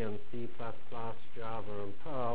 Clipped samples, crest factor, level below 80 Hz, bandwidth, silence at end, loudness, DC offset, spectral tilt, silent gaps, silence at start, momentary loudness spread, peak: under 0.1%; 18 dB; -62 dBFS; 4 kHz; 0 s; -43 LUFS; 4%; -9.5 dB/octave; none; 0 s; 4 LU; -22 dBFS